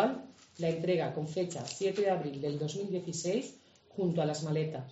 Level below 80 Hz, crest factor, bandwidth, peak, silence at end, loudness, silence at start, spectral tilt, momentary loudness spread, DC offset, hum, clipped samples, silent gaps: -74 dBFS; 18 dB; 8 kHz; -16 dBFS; 0 s; -34 LUFS; 0 s; -6 dB/octave; 5 LU; under 0.1%; none; under 0.1%; none